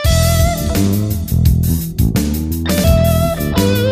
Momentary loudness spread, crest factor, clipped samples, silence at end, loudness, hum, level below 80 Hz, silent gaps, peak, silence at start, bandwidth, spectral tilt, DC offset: 5 LU; 12 dB; under 0.1%; 0 s; -15 LUFS; none; -20 dBFS; none; 0 dBFS; 0 s; 16 kHz; -5.5 dB/octave; under 0.1%